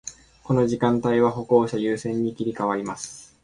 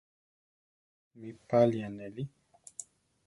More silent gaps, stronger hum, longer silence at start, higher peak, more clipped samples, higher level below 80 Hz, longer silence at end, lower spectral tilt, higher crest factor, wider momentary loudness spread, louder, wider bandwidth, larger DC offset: neither; neither; second, 0.05 s vs 1.15 s; first, -4 dBFS vs -12 dBFS; neither; first, -56 dBFS vs -72 dBFS; second, 0.2 s vs 0.45 s; about the same, -6.5 dB/octave vs -7 dB/octave; second, 18 dB vs 24 dB; second, 12 LU vs 22 LU; first, -23 LUFS vs -31 LUFS; about the same, 11 kHz vs 11.5 kHz; neither